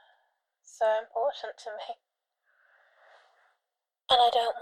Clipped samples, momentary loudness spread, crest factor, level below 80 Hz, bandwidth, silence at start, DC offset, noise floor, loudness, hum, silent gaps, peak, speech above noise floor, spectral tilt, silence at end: under 0.1%; 20 LU; 20 dB; -72 dBFS; 13 kHz; 0.8 s; under 0.1%; -88 dBFS; -27 LUFS; none; none; -10 dBFS; 60 dB; -0.5 dB/octave; 0 s